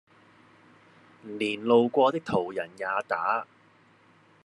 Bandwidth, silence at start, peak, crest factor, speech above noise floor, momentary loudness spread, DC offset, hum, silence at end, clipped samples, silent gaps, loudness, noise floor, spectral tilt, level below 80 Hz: 11 kHz; 1.25 s; -10 dBFS; 20 dB; 34 dB; 16 LU; under 0.1%; none; 1 s; under 0.1%; none; -27 LUFS; -60 dBFS; -6 dB/octave; -74 dBFS